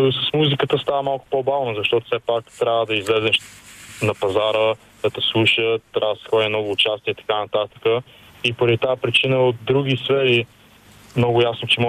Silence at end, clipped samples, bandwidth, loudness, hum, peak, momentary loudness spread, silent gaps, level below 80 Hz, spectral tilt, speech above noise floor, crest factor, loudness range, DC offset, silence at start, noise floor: 0 s; under 0.1%; 14.5 kHz; -20 LUFS; none; -4 dBFS; 7 LU; none; -58 dBFS; -5.5 dB/octave; 28 dB; 16 dB; 2 LU; under 0.1%; 0 s; -48 dBFS